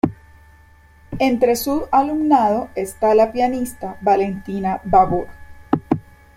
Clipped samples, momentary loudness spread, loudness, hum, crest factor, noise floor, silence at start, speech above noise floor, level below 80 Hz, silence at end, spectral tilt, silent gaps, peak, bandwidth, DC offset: under 0.1%; 9 LU; -19 LUFS; none; 18 dB; -48 dBFS; 0.05 s; 31 dB; -44 dBFS; 0.35 s; -6 dB/octave; none; -2 dBFS; 16.5 kHz; under 0.1%